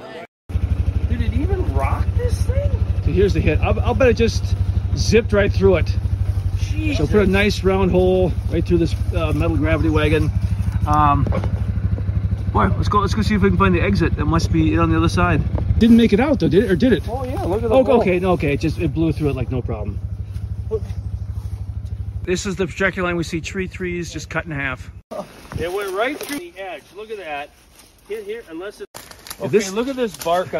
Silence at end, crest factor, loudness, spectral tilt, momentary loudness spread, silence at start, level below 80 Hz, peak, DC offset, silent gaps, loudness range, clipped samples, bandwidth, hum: 0 s; 16 dB; -19 LUFS; -7 dB/octave; 14 LU; 0 s; -26 dBFS; -2 dBFS; under 0.1%; 0.28-0.49 s, 25.04-25.10 s, 28.87-28.94 s; 10 LU; under 0.1%; 13.5 kHz; none